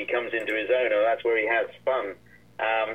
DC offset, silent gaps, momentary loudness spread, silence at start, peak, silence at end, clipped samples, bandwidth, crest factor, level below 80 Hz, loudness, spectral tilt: 0.1%; none; 7 LU; 0 s; -12 dBFS; 0 s; under 0.1%; 8.6 kHz; 14 dB; -68 dBFS; -25 LUFS; -5 dB/octave